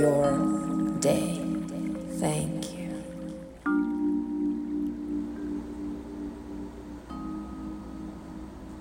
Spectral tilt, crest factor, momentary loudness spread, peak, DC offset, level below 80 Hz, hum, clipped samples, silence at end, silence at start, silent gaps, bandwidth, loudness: -6 dB/octave; 18 dB; 15 LU; -12 dBFS; under 0.1%; -50 dBFS; none; under 0.1%; 0 s; 0 s; none; 17 kHz; -31 LUFS